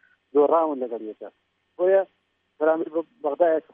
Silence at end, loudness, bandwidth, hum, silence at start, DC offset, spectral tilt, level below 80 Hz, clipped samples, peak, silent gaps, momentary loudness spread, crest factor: 0.15 s; -23 LUFS; 3.7 kHz; none; 0.35 s; under 0.1%; -9.5 dB/octave; -84 dBFS; under 0.1%; -8 dBFS; none; 16 LU; 16 dB